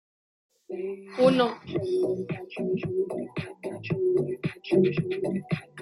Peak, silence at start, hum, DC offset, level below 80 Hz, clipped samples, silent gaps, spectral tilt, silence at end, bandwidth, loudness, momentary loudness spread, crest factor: -8 dBFS; 0.7 s; none; under 0.1%; -64 dBFS; under 0.1%; none; -7.5 dB/octave; 0 s; 11.5 kHz; -28 LUFS; 13 LU; 20 dB